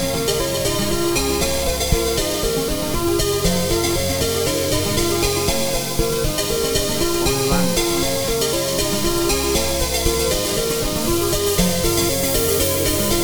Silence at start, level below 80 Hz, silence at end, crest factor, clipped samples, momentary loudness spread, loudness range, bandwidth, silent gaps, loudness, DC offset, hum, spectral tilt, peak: 0 s; -30 dBFS; 0 s; 16 dB; under 0.1%; 3 LU; 1 LU; over 20 kHz; none; -19 LUFS; under 0.1%; none; -3.5 dB/octave; -2 dBFS